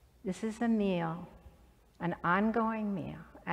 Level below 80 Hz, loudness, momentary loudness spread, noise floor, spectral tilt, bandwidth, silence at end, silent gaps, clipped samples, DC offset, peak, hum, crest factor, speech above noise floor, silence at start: -60 dBFS; -33 LUFS; 15 LU; -62 dBFS; -7 dB/octave; 10.5 kHz; 0 s; none; under 0.1%; under 0.1%; -16 dBFS; none; 18 dB; 29 dB; 0.25 s